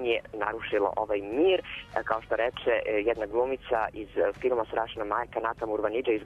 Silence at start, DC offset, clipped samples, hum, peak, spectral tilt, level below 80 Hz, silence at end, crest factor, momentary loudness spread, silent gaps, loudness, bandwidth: 0 s; under 0.1%; under 0.1%; none; -8 dBFS; -6.5 dB/octave; -54 dBFS; 0 s; 20 dB; 6 LU; none; -29 LUFS; 7.4 kHz